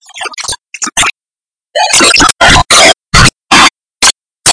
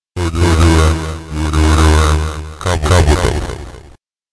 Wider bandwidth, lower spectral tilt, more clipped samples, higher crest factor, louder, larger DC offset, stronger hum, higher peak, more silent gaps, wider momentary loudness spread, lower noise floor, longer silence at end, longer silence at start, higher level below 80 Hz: about the same, 11 kHz vs 11 kHz; second, -1.5 dB/octave vs -5.5 dB/octave; first, 5% vs under 0.1%; about the same, 8 dB vs 12 dB; first, -6 LUFS vs -13 LUFS; second, under 0.1% vs 0.2%; neither; about the same, 0 dBFS vs -2 dBFS; neither; about the same, 14 LU vs 12 LU; first, under -90 dBFS vs -43 dBFS; second, 0 s vs 0.5 s; about the same, 0.15 s vs 0.15 s; second, -24 dBFS vs -18 dBFS